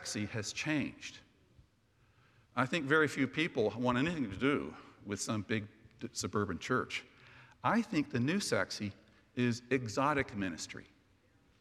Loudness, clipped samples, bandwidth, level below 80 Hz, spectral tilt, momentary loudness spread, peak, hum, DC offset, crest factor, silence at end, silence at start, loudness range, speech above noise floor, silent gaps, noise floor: -35 LUFS; under 0.1%; 14 kHz; -68 dBFS; -4.5 dB/octave; 12 LU; -14 dBFS; none; under 0.1%; 22 dB; 0.75 s; 0 s; 3 LU; 35 dB; none; -70 dBFS